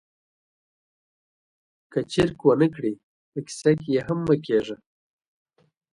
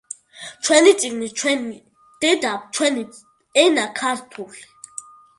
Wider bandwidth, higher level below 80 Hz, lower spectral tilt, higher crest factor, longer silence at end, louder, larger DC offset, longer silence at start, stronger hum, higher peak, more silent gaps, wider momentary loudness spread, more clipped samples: about the same, 11.5 kHz vs 11.5 kHz; first, -58 dBFS vs -70 dBFS; first, -6.5 dB/octave vs -1.5 dB/octave; about the same, 22 dB vs 20 dB; first, 1.2 s vs 0.4 s; second, -24 LUFS vs -19 LUFS; neither; first, 1.9 s vs 0.35 s; neither; second, -4 dBFS vs 0 dBFS; first, 3.03-3.32 s vs none; second, 16 LU vs 22 LU; neither